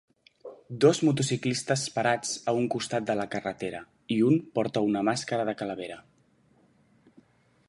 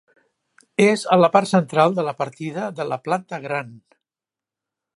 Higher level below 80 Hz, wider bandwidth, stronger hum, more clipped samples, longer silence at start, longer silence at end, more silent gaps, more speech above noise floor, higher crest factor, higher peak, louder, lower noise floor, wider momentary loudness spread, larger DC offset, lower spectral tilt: about the same, -68 dBFS vs -72 dBFS; about the same, 11.5 kHz vs 11.5 kHz; neither; neither; second, 0.45 s vs 0.8 s; first, 1.7 s vs 1.2 s; neither; second, 37 dB vs over 70 dB; about the same, 20 dB vs 20 dB; second, -8 dBFS vs -2 dBFS; second, -27 LUFS vs -20 LUFS; second, -64 dBFS vs under -90 dBFS; first, 17 LU vs 12 LU; neither; about the same, -5 dB/octave vs -6 dB/octave